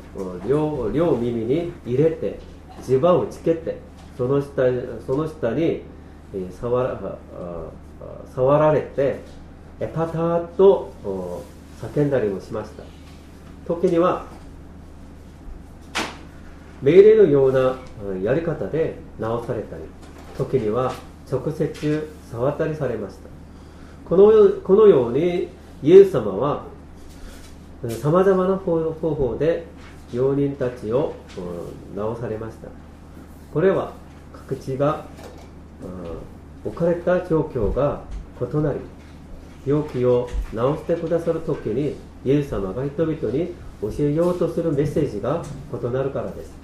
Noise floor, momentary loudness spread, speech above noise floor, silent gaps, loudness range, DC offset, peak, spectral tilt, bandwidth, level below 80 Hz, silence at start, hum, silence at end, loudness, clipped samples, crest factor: -41 dBFS; 23 LU; 21 dB; none; 8 LU; under 0.1%; 0 dBFS; -8 dB/octave; 12.5 kHz; -42 dBFS; 0 s; none; 0 s; -21 LUFS; under 0.1%; 22 dB